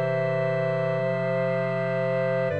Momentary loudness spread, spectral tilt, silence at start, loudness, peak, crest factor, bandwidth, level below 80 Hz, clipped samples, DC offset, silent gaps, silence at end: 1 LU; -8.5 dB/octave; 0 s; -25 LUFS; -14 dBFS; 10 dB; 8.4 kHz; -76 dBFS; under 0.1%; 0.2%; none; 0 s